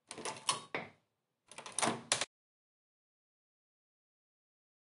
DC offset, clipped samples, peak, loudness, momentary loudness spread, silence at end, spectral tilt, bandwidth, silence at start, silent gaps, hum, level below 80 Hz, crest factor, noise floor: under 0.1%; under 0.1%; -12 dBFS; -37 LUFS; 17 LU; 2.55 s; -1 dB/octave; 11.5 kHz; 0.1 s; none; none; -88 dBFS; 32 dB; -82 dBFS